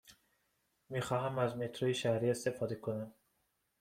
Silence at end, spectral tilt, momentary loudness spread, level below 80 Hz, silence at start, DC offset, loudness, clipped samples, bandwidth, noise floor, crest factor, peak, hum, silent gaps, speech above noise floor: 0.7 s; -5.5 dB/octave; 9 LU; -74 dBFS; 0.05 s; under 0.1%; -37 LUFS; under 0.1%; 16 kHz; -80 dBFS; 18 dB; -20 dBFS; none; none; 45 dB